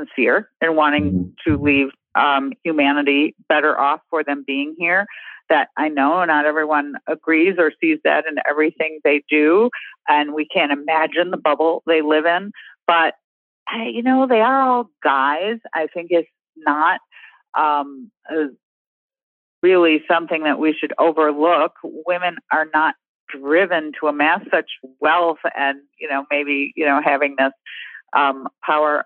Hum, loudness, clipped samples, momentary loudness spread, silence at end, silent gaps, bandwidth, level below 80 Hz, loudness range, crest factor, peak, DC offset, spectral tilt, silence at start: none; -18 LUFS; under 0.1%; 9 LU; 0.05 s; 13.24-13.66 s, 16.49-16.53 s, 17.49-17.53 s, 18.63-19.09 s, 19.23-19.62 s, 23.09-23.27 s; 4.3 kHz; -56 dBFS; 3 LU; 18 dB; 0 dBFS; under 0.1%; -8.5 dB/octave; 0 s